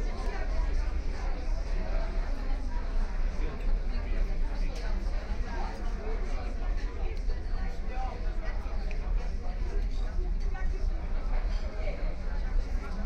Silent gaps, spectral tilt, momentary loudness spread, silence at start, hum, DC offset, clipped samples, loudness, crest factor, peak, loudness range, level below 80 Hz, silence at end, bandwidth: none; -6.5 dB/octave; 2 LU; 0 s; none; under 0.1%; under 0.1%; -36 LUFS; 10 dB; -18 dBFS; 1 LU; -30 dBFS; 0 s; 6.6 kHz